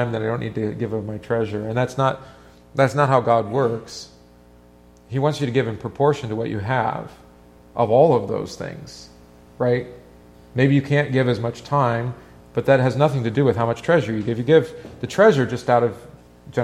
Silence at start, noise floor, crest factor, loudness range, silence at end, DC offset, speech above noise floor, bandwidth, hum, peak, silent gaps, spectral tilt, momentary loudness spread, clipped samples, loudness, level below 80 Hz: 0 s; -49 dBFS; 20 dB; 5 LU; 0 s; under 0.1%; 30 dB; 12 kHz; 60 Hz at -45 dBFS; -2 dBFS; none; -7 dB/octave; 16 LU; under 0.1%; -20 LUFS; -52 dBFS